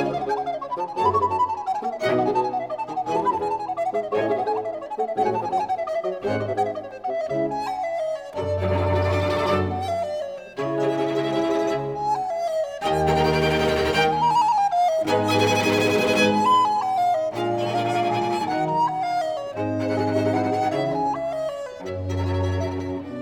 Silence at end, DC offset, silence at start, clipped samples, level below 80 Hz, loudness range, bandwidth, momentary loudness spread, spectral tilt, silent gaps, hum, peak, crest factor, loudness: 0 s; under 0.1%; 0 s; under 0.1%; -50 dBFS; 6 LU; 20 kHz; 9 LU; -5.5 dB/octave; none; none; -8 dBFS; 14 dB; -23 LUFS